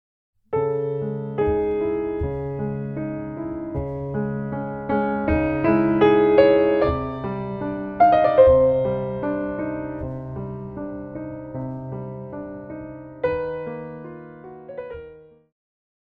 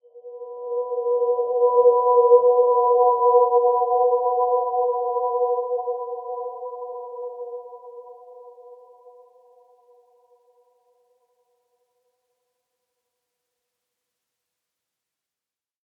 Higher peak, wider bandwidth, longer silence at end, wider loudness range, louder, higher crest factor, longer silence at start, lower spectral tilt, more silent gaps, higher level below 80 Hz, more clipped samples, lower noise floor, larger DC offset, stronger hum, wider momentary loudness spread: about the same, -2 dBFS vs -4 dBFS; first, 4.9 kHz vs 1.1 kHz; second, 0.85 s vs 7.15 s; second, 14 LU vs 21 LU; about the same, -22 LUFS vs -20 LUFS; about the same, 20 dB vs 20 dB; first, 0.5 s vs 0.15 s; first, -10 dB/octave vs -8 dB/octave; neither; first, -42 dBFS vs -88 dBFS; neither; second, -45 dBFS vs under -90 dBFS; neither; neither; about the same, 20 LU vs 19 LU